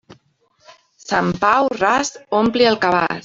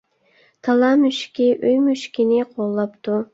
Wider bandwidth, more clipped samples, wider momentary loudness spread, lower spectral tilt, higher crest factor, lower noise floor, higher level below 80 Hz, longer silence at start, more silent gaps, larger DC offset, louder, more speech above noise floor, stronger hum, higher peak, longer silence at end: about the same, 7.8 kHz vs 8 kHz; neither; second, 5 LU vs 8 LU; second, -4 dB/octave vs -5.5 dB/octave; about the same, 16 dB vs 14 dB; about the same, -59 dBFS vs -58 dBFS; first, -52 dBFS vs -66 dBFS; second, 0.1 s vs 0.65 s; neither; neither; about the same, -17 LUFS vs -19 LUFS; about the same, 42 dB vs 40 dB; neither; about the same, -2 dBFS vs -4 dBFS; about the same, 0.05 s vs 0.1 s